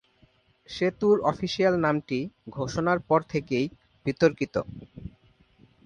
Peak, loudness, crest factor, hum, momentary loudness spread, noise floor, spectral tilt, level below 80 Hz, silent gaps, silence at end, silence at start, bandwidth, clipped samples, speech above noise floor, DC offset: -8 dBFS; -26 LUFS; 20 dB; none; 18 LU; -63 dBFS; -6.5 dB/octave; -56 dBFS; none; 0.75 s; 0.7 s; 9.6 kHz; under 0.1%; 37 dB; under 0.1%